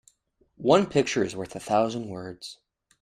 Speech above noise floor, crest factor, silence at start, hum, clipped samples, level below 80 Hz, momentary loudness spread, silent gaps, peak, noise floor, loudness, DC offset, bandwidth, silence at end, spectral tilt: 42 dB; 22 dB; 0.6 s; none; under 0.1%; -62 dBFS; 18 LU; none; -4 dBFS; -67 dBFS; -25 LUFS; under 0.1%; 13.5 kHz; 0.45 s; -5 dB/octave